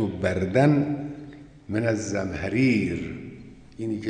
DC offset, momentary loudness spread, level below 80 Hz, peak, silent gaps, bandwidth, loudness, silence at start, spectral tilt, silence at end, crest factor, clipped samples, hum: under 0.1%; 22 LU; -52 dBFS; -6 dBFS; none; 10 kHz; -25 LUFS; 0 s; -7 dB/octave; 0 s; 18 dB; under 0.1%; none